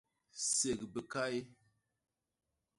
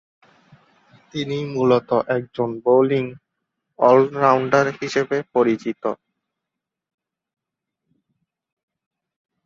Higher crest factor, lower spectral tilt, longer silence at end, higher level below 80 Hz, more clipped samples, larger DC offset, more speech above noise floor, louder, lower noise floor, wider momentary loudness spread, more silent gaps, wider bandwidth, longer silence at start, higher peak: about the same, 20 dB vs 20 dB; second, -2 dB/octave vs -6.5 dB/octave; second, 1.25 s vs 3.5 s; second, -72 dBFS vs -66 dBFS; neither; neither; second, 51 dB vs 65 dB; second, -37 LUFS vs -19 LUFS; first, -90 dBFS vs -84 dBFS; about the same, 10 LU vs 12 LU; neither; first, 11.5 kHz vs 7.6 kHz; second, 0.35 s vs 1.15 s; second, -22 dBFS vs -2 dBFS